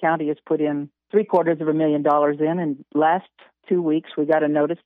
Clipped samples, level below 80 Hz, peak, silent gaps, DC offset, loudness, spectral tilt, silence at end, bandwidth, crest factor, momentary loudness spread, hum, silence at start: under 0.1%; -76 dBFS; -6 dBFS; none; under 0.1%; -21 LUFS; -9.5 dB/octave; 0.1 s; 3.9 kHz; 14 dB; 6 LU; none; 0 s